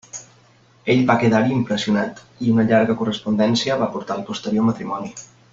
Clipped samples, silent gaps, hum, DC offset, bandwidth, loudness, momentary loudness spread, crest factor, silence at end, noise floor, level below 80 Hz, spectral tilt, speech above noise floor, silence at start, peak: under 0.1%; none; none; under 0.1%; 7.8 kHz; -20 LUFS; 13 LU; 18 dB; 0.25 s; -53 dBFS; -56 dBFS; -6 dB/octave; 34 dB; 0.15 s; -2 dBFS